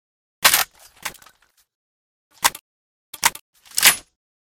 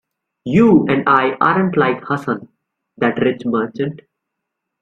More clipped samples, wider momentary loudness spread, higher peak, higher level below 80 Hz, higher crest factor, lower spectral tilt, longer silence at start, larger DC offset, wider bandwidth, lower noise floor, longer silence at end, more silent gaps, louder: neither; first, 19 LU vs 13 LU; about the same, 0 dBFS vs -2 dBFS; about the same, -58 dBFS vs -54 dBFS; first, 24 dB vs 16 dB; second, 1.5 dB/octave vs -8.5 dB/octave; about the same, 0.4 s vs 0.45 s; neither; first, 19.5 kHz vs 7.6 kHz; second, -56 dBFS vs -78 dBFS; second, 0.6 s vs 0.85 s; first, 1.75-2.31 s, 2.61-3.13 s, 3.41-3.53 s vs none; about the same, -18 LUFS vs -16 LUFS